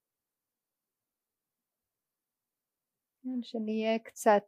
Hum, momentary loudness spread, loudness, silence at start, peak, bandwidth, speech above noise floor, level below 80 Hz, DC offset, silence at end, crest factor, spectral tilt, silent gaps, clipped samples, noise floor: none; 11 LU; -32 LUFS; 3.25 s; -12 dBFS; 15 kHz; over 60 dB; under -90 dBFS; under 0.1%; 0.05 s; 24 dB; -4.5 dB/octave; none; under 0.1%; under -90 dBFS